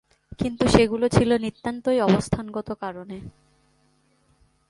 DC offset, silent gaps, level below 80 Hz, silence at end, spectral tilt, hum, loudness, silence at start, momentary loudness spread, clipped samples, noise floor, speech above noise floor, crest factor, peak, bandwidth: under 0.1%; none; -44 dBFS; 1.4 s; -6 dB/octave; none; -23 LUFS; 0.4 s; 15 LU; under 0.1%; -64 dBFS; 42 dB; 24 dB; 0 dBFS; 11.5 kHz